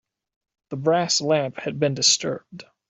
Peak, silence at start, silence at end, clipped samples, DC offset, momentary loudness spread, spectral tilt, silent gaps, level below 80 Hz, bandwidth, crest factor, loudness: -4 dBFS; 0.7 s; 0.3 s; under 0.1%; under 0.1%; 13 LU; -3 dB/octave; none; -68 dBFS; 8.4 kHz; 20 dB; -21 LUFS